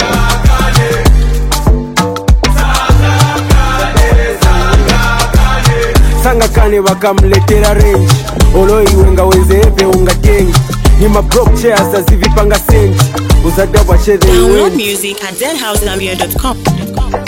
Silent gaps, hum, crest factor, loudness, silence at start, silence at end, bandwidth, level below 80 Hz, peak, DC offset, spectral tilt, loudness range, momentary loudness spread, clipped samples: none; none; 8 dB; -9 LUFS; 0 s; 0 s; 17 kHz; -10 dBFS; 0 dBFS; 0.2%; -5 dB/octave; 2 LU; 6 LU; 5%